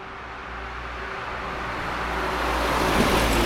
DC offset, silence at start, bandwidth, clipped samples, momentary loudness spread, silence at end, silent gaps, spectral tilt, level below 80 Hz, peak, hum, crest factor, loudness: under 0.1%; 0 s; 17 kHz; under 0.1%; 14 LU; 0 s; none; -4 dB/octave; -34 dBFS; -8 dBFS; none; 18 dB; -26 LUFS